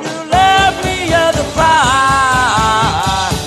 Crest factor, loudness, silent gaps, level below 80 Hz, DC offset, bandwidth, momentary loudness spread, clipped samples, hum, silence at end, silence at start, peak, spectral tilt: 12 dB; -11 LUFS; none; -30 dBFS; under 0.1%; 13 kHz; 5 LU; under 0.1%; none; 0 s; 0 s; 0 dBFS; -3.5 dB/octave